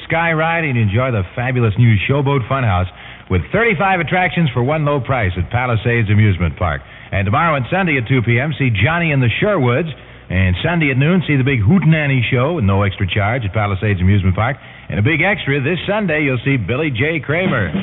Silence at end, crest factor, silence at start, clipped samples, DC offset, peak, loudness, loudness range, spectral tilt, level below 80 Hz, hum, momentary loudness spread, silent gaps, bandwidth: 0 s; 14 dB; 0 s; under 0.1%; under 0.1%; -2 dBFS; -16 LUFS; 2 LU; -12 dB/octave; -38 dBFS; none; 6 LU; none; 4 kHz